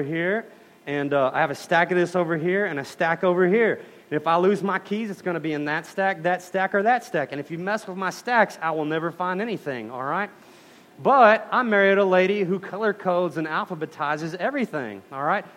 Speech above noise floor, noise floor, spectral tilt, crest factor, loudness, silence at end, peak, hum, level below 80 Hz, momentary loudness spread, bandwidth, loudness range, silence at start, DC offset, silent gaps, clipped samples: 27 dB; -50 dBFS; -6 dB/octave; 20 dB; -23 LUFS; 0.05 s; -2 dBFS; none; -74 dBFS; 11 LU; 15.5 kHz; 5 LU; 0 s; under 0.1%; none; under 0.1%